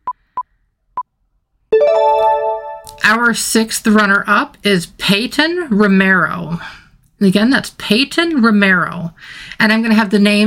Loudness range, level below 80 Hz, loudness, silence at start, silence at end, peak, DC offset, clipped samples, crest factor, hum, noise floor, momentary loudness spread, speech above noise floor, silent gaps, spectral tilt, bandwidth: 2 LU; -48 dBFS; -13 LUFS; 0.05 s; 0 s; 0 dBFS; under 0.1%; under 0.1%; 14 dB; none; -64 dBFS; 17 LU; 51 dB; none; -4.5 dB/octave; 16.5 kHz